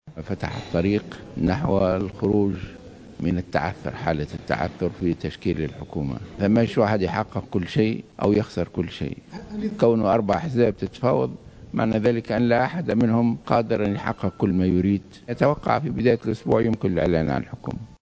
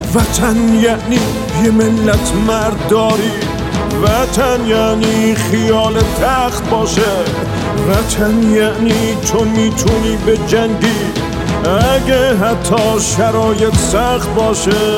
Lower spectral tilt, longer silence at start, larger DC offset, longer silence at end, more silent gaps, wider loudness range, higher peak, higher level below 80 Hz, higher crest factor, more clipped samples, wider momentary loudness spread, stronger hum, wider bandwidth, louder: first, -8 dB/octave vs -5 dB/octave; about the same, 0.05 s vs 0 s; neither; about the same, 0.05 s vs 0 s; neither; first, 4 LU vs 1 LU; second, -4 dBFS vs 0 dBFS; second, -42 dBFS vs -26 dBFS; first, 20 dB vs 12 dB; neither; first, 10 LU vs 5 LU; neither; second, 8 kHz vs 16.5 kHz; second, -23 LUFS vs -13 LUFS